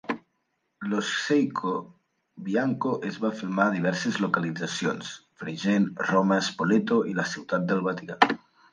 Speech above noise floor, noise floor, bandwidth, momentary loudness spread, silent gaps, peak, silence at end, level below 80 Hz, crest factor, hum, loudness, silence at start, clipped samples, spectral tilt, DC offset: 50 dB; -76 dBFS; 9.8 kHz; 11 LU; none; -2 dBFS; 0.35 s; -72 dBFS; 24 dB; none; -26 LUFS; 0.05 s; under 0.1%; -5.5 dB/octave; under 0.1%